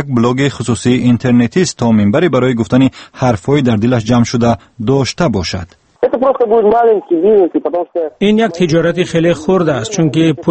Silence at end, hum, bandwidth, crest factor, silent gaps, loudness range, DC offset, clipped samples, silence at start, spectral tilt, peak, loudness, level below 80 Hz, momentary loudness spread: 0 s; none; 8.8 kHz; 12 dB; none; 2 LU; under 0.1%; under 0.1%; 0 s; -6.5 dB/octave; 0 dBFS; -12 LUFS; -42 dBFS; 6 LU